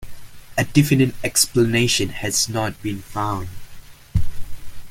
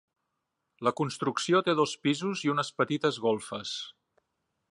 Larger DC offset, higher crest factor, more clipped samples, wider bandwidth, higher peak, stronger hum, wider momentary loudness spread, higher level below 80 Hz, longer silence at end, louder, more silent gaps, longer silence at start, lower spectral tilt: neither; about the same, 18 dB vs 18 dB; neither; first, 17 kHz vs 11.5 kHz; first, -2 dBFS vs -12 dBFS; neither; first, 13 LU vs 9 LU; first, -36 dBFS vs -76 dBFS; second, 0 s vs 0.8 s; first, -20 LUFS vs -29 LUFS; neither; second, 0 s vs 0.8 s; about the same, -4 dB/octave vs -4.5 dB/octave